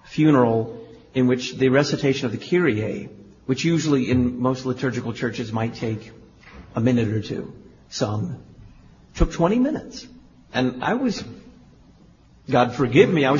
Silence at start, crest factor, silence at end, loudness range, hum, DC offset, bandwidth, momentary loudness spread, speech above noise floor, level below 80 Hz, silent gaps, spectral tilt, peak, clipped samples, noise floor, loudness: 0.05 s; 20 dB; 0 s; 5 LU; none; under 0.1%; 7.4 kHz; 15 LU; 31 dB; -40 dBFS; none; -6.5 dB/octave; -2 dBFS; under 0.1%; -52 dBFS; -22 LUFS